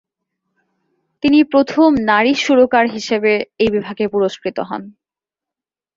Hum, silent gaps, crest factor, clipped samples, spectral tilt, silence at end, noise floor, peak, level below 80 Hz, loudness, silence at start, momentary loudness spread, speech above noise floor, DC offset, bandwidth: none; none; 16 dB; under 0.1%; -5 dB/octave; 1.05 s; -87 dBFS; -2 dBFS; -52 dBFS; -15 LUFS; 1.25 s; 11 LU; 73 dB; under 0.1%; 7.6 kHz